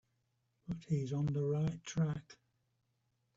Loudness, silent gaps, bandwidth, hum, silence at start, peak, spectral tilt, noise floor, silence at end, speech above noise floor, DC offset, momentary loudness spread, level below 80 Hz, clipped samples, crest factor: -38 LUFS; none; 7.8 kHz; none; 0.7 s; -24 dBFS; -7.5 dB/octave; -81 dBFS; 1.05 s; 45 dB; under 0.1%; 11 LU; -66 dBFS; under 0.1%; 14 dB